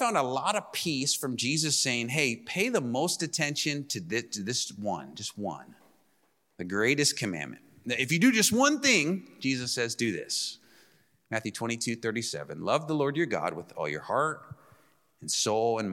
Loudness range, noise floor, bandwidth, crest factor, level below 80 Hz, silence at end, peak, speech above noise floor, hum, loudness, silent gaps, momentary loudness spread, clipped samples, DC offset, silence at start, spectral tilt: 6 LU; -71 dBFS; 16.5 kHz; 22 dB; -72 dBFS; 0 s; -8 dBFS; 42 dB; none; -28 LUFS; none; 12 LU; under 0.1%; under 0.1%; 0 s; -3 dB/octave